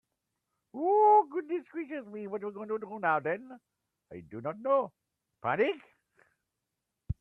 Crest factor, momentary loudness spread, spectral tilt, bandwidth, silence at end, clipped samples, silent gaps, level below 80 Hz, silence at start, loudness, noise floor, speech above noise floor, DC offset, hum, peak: 18 dB; 18 LU; -8.5 dB/octave; 3.8 kHz; 0.05 s; under 0.1%; none; -60 dBFS; 0.75 s; -30 LUFS; -86 dBFS; 53 dB; under 0.1%; none; -14 dBFS